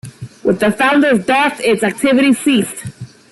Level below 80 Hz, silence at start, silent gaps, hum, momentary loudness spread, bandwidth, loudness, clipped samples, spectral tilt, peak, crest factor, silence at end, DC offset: -52 dBFS; 0.05 s; none; none; 12 LU; 12.5 kHz; -13 LUFS; under 0.1%; -4.5 dB/octave; -2 dBFS; 12 dB; 0.25 s; under 0.1%